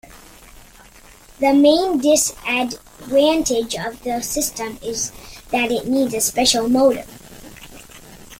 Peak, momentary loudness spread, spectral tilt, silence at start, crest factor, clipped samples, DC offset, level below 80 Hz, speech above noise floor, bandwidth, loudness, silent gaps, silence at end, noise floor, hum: -2 dBFS; 24 LU; -2.5 dB/octave; 0.1 s; 18 dB; under 0.1%; under 0.1%; -46 dBFS; 27 dB; 17 kHz; -18 LUFS; none; 0.05 s; -45 dBFS; none